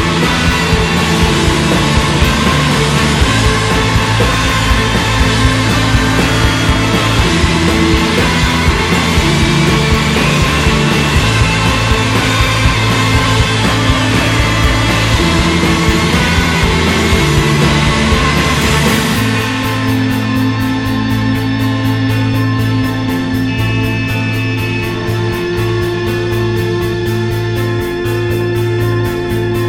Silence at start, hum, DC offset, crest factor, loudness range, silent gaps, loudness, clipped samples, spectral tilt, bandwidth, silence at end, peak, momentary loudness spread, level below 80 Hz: 0 s; none; under 0.1%; 12 dB; 4 LU; none; -12 LUFS; under 0.1%; -5 dB/octave; 17 kHz; 0 s; 0 dBFS; 5 LU; -22 dBFS